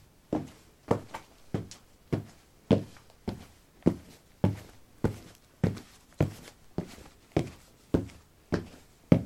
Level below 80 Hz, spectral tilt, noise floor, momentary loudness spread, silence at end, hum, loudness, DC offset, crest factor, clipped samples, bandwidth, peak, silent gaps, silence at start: -52 dBFS; -8 dB/octave; -53 dBFS; 21 LU; 0 s; none; -33 LUFS; under 0.1%; 28 dB; under 0.1%; 16.5 kHz; -6 dBFS; none; 0.3 s